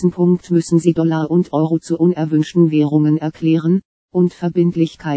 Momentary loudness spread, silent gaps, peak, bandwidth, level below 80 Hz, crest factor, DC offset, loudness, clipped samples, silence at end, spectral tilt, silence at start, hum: 4 LU; 3.85-4.09 s; 0 dBFS; 8 kHz; -56 dBFS; 14 dB; under 0.1%; -16 LUFS; under 0.1%; 0 s; -8 dB/octave; 0 s; none